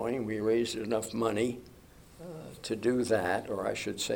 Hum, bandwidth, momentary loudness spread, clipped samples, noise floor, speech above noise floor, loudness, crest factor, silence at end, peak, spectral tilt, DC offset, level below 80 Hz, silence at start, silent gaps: none; 18.5 kHz; 16 LU; under 0.1%; -53 dBFS; 22 dB; -31 LUFS; 18 dB; 0 s; -14 dBFS; -4.5 dB/octave; under 0.1%; -62 dBFS; 0 s; none